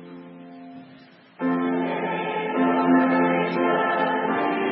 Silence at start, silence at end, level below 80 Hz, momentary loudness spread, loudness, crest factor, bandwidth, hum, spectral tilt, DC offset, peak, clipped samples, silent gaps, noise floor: 0 s; 0 s; -78 dBFS; 23 LU; -22 LUFS; 16 dB; 5.6 kHz; none; -10.5 dB/octave; under 0.1%; -8 dBFS; under 0.1%; none; -49 dBFS